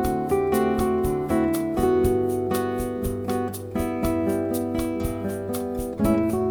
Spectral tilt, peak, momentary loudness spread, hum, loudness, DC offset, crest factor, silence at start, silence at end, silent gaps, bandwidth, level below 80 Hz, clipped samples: -6.5 dB/octave; -8 dBFS; 7 LU; none; -24 LUFS; under 0.1%; 14 dB; 0 s; 0 s; none; over 20 kHz; -38 dBFS; under 0.1%